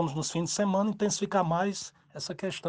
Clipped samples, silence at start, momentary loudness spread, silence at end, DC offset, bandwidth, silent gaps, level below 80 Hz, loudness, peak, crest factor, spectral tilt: under 0.1%; 0 s; 12 LU; 0 s; under 0.1%; 10 kHz; none; -64 dBFS; -30 LUFS; -12 dBFS; 18 dB; -4.5 dB/octave